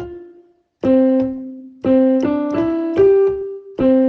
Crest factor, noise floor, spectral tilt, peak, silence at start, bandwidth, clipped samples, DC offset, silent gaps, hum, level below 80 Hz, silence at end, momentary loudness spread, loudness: 12 dB; -50 dBFS; -8.5 dB/octave; -4 dBFS; 0 s; 6 kHz; under 0.1%; under 0.1%; none; none; -48 dBFS; 0 s; 15 LU; -16 LUFS